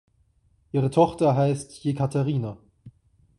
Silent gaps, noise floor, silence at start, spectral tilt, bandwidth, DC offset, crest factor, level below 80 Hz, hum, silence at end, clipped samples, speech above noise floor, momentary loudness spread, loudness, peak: none; -64 dBFS; 0.75 s; -8 dB/octave; 11.5 kHz; under 0.1%; 20 dB; -58 dBFS; none; 0.5 s; under 0.1%; 41 dB; 9 LU; -24 LUFS; -6 dBFS